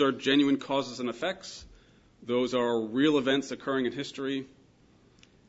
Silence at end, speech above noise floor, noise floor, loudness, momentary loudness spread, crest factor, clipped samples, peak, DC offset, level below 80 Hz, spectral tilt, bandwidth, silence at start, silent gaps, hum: 1 s; 33 dB; -61 dBFS; -29 LUFS; 15 LU; 16 dB; under 0.1%; -12 dBFS; under 0.1%; -66 dBFS; -5 dB/octave; 8 kHz; 0 s; none; none